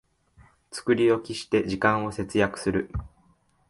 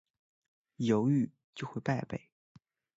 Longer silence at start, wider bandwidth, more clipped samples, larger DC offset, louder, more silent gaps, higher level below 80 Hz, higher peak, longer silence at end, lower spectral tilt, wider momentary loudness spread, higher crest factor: about the same, 0.7 s vs 0.8 s; first, 11.5 kHz vs 7.8 kHz; neither; neither; first, -25 LUFS vs -33 LUFS; second, none vs 1.44-1.53 s; first, -48 dBFS vs -70 dBFS; first, -6 dBFS vs -16 dBFS; second, 0.6 s vs 0.8 s; second, -5.5 dB/octave vs -7.5 dB/octave; second, 12 LU vs 15 LU; about the same, 20 dB vs 20 dB